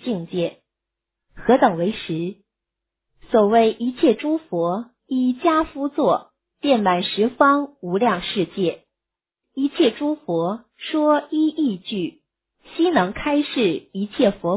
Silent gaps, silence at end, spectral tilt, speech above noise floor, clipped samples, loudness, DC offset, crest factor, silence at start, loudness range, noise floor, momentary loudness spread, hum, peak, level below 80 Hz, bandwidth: none; 0 s; -10 dB/octave; 67 dB; under 0.1%; -21 LUFS; under 0.1%; 20 dB; 0.05 s; 3 LU; -87 dBFS; 10 LU; none; -2 dBFS; -54 dBFS; 4 kHz